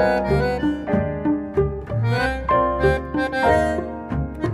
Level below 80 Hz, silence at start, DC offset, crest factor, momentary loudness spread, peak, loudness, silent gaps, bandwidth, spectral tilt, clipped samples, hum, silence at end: -32 dBFS; 0 s; under 0.1%; 16 dB; 7 LU; -6 dBFS; -21 LUFS; none; 13 kHz; -7.5 dB/octave; under 0.1%; none; 0 s